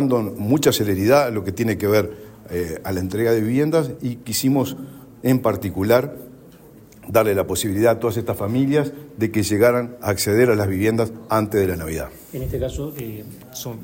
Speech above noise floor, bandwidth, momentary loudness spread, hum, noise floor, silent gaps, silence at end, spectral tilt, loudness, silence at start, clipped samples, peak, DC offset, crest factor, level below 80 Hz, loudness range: 25 dB; 16.5 kHz; 13 LU; none; -45 dBFS; none; 0 s; -5.5 dB/octave; -20 LUFS; 0 s; under 0.1%; -4 dBFS; under 0.1%; 16 dB; -44 dBFS; 3 LU